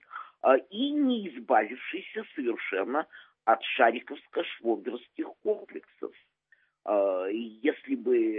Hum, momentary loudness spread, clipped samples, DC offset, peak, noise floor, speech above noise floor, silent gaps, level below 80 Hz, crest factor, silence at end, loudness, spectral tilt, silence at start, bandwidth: none; 15 LU; under 0.1%; under 0.1%; -6 dBFS; -68 dBFS; 39 dB; none; -88 dBFS; 22 dB; 0 s; -29 LUFS; -8 dB/octave; 0.1 s; 4 kHz